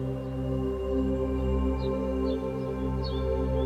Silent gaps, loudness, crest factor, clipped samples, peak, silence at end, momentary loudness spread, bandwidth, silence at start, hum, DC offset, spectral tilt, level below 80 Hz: none; -30 LUFS; 12 dB; under 0.1%; -16 dBFS; 0 s; 3 LU; 8 kHz; 0 s; none; under 0.1%; -9 dB/octave; -34 dBFS